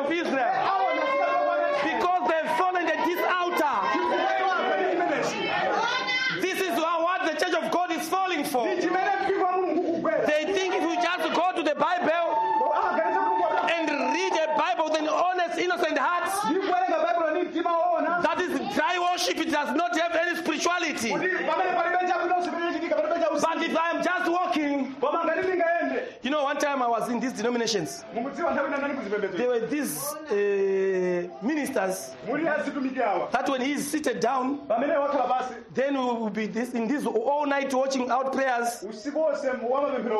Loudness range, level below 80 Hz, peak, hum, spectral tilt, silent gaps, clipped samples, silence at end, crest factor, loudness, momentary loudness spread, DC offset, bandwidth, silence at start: 3 LU; -70 dBFS; -12 dBFS; none; -3.5 dB/octave; none; under 0.1%; 0 s; 14 dB; -26 LUFS; 4 LU; under 0.1%; 13 kHz; 0 s